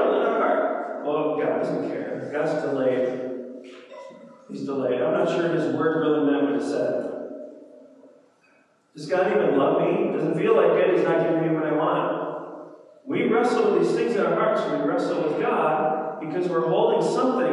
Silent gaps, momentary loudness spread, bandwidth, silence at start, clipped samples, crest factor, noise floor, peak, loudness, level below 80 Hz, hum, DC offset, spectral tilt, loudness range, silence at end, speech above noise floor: none; 15 LU; 11 kHz; 0 s; under 0.1%; 18 dB; -61 dBFS; -6 dBFS; -23 LUFS; -88 dBFS; none; under 0.1%; -7 dB/octave; 6 LU; 0 s; 39 dB